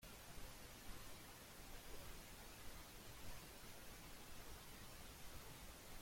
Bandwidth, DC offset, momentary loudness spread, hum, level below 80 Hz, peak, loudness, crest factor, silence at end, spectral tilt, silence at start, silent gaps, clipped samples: 16.5 kHz; under 0.1%; 1 LU; none; -62 dBFS; -40 dBFS; -58 LUFS; 16 dB; 0 s; -3 dB/octave; 0 s; none; under 0.1%